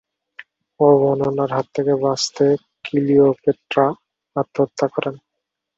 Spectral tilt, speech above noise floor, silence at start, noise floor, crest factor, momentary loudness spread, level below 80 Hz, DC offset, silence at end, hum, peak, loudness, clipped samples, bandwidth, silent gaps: -6 dB/octave; 62 dB; 0.8 s; -80 dBFS; 16 dB; 10 LU; -62 dBFS; under 0.1%; 0.6 s; none; -2 dBFS; -19 LUFS; under 0.1%; 8 kHz; none